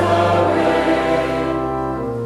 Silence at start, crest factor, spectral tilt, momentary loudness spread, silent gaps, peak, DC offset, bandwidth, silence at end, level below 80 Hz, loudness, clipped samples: 0 s; 12 dB; -6.5 dB/octave; 7 LU; none; -6 dBFS; under 0.1%; 13 kHz; 0 s; -40 dBFS; -17 LUFS; under 0.1%